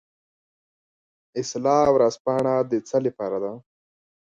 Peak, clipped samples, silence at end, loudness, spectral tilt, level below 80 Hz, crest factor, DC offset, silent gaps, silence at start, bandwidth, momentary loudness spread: -6 dBFS; under 0.1%; 0.75 s; -23 LUFS; -6 dB/octave; -60 dBFS; 20 dB; under 0.1%; 2.20-2.25 s; 1.35 s; 9.4 kHz; 14 LU